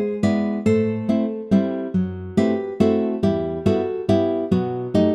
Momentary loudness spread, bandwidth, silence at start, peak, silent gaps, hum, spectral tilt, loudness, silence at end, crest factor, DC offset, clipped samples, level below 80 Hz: 3 LU; 10.5 kHz; 0 s; -2 dBFS; none; none; -8.5 dB/octave; -21 LUFS; 0 s; 18 dB; under 0.1%; under 0.1%; -52 dBFS